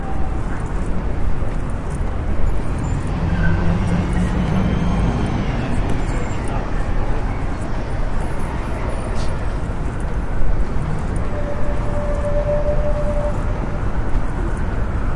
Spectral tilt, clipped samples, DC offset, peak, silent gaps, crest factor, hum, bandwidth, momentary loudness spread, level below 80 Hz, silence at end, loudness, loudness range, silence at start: -7.5 dB/octave; under 0.1%; under 0.1%; -2 dBFS; none; 14 dB; none; 11 kHz; 6 LU; -22 dBFS; 0 s; -23 LUFS; 5 LU; 0 s